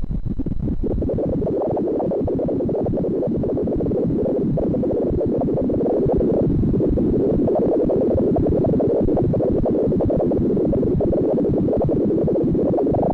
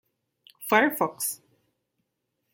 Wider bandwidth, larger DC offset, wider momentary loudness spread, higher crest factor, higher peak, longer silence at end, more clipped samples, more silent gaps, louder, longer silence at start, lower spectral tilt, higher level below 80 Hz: second, 4.8 kHz vs 17 kHz; neither; second, 3 LU vs 18 LU; second, 8 dB vs 24 dB; second, -12 dBFS vs -6 dBFS; second, 0 s vs 1.2 s; neither; neither; first, -20 LUFS vs -25 LUFS; second, 0 s vs 0.6 s; first, -12.5 dB/octave vs -3 dB/octave; first, -30 dBFS vs -78 dBFS